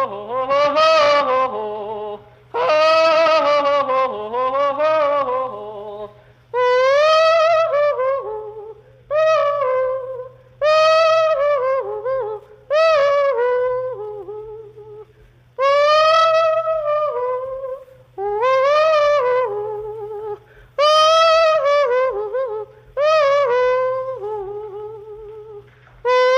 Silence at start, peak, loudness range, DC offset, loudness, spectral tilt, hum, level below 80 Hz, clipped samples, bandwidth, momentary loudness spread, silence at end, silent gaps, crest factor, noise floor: 0 s; -4 dBFS; 4 LU; under 0.1%; -17 LUFS; -2.5 dB/octave; none; -56 dBFS; under 0.1%; 9.2 kHz; 18 LU; 0 s; none; 14 dB; -50 dBFS